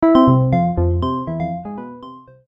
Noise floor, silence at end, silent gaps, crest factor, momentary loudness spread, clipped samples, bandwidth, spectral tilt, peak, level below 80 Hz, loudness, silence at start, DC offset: -39 dBFS; 0.3 s; none; 16 dB; 20 LU; under 0.1%; 5.6 kHz; -10.5 dB/octave; 0 dBFS; -34 dBFS; -17 LUFS; 0 s; under 0.1%